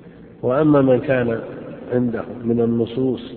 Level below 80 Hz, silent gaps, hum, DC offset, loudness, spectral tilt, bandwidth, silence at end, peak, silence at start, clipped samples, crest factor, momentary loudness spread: -52 dBFS; none; none; under 0.1%; -19 LUFS; -12 dB/octave; 4.3 kHz; 0 s; -4 dBFS; 0 s; under 0.1%; 16 dB; 11 LU